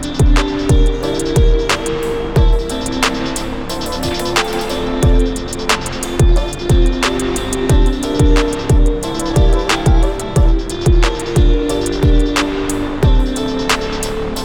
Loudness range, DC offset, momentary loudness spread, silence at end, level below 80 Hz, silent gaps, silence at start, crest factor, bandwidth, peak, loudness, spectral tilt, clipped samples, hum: 2 LU; under 0.1%; 6 LU; 0 s; -16 dBFS; none; 0 s; 12 dB; 16.5 kHz; -2 dBFS; -16 LUFS; -5 dB/octave; under 0.1%; none